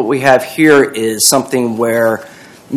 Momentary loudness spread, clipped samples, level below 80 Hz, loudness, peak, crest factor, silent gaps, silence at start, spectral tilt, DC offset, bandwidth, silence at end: 7 LU; 0.9%; -56 dBFS; -11 LUFS; 0 dBFS; 12 dB; none; 0 s; -3.5 dB/octave; under 0.1%; over 20 kHz; 0 s